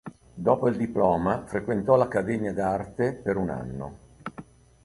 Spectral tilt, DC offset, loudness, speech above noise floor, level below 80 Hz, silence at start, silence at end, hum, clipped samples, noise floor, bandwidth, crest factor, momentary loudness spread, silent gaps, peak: -8.5 dB/octave; under 0.1%; -26 LUFS; 22 dB; -52 dBFS; 0.05 s; 0.45 s; none; under 0.1%; -47 dBFS; 11.5 kHz; 20 dB; 19 LU; none; -6 dBFS